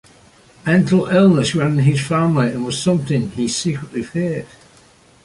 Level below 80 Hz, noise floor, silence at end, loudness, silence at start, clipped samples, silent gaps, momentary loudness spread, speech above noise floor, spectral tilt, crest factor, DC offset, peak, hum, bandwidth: -50 dBFS; -49 dBFS; 0.8 s; -17 LUFS; 0.65 s; under 0.1%; none; 11 LU; 33 dB; -6 dB/octave; 14 dB; under 0.1%; -2 dBFS; none; 11.5 kHz